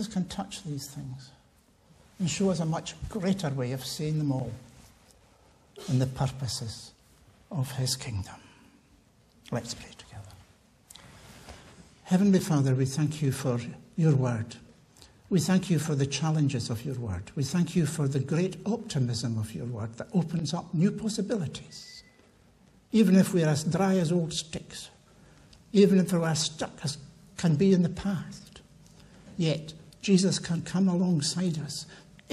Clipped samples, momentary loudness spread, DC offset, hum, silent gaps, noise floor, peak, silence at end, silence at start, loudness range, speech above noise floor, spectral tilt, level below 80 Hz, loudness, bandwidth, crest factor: under 0.1%; 20 LU; under 0.1%; none; none; -62 dBFS; -10 dBFS; 0.3 s; 0 s; 9 LU; 35 dB; -6 dB/octave; -58 dBFS; -28 LUFS; 14 kHz; 20 dB